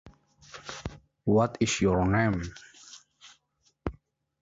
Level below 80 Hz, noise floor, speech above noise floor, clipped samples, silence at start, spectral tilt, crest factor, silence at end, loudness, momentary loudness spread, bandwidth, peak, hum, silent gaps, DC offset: -48 dBFS; -71 dBFS; 45 dB; under 0.1%; 0.05 s; -5.5 dB/octave; 18 dB; 0.5 s; -28 LUFS; 24 LU; 8 kHz; -12 dBFS; none; none; under 0.1%